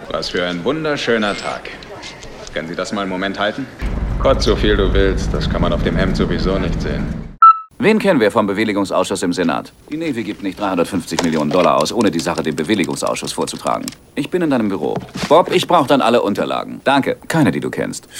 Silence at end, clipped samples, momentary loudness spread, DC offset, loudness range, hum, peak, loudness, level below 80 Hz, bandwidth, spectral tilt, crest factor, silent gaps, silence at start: 0 s; under 0.1%; 11 LU; under 0.1%; 6 LU; none; 0 dBFS; -17 LUFS; -28 dBFS; 16.5 kHz; -5 dB/octave; 16 dB; none; 0 s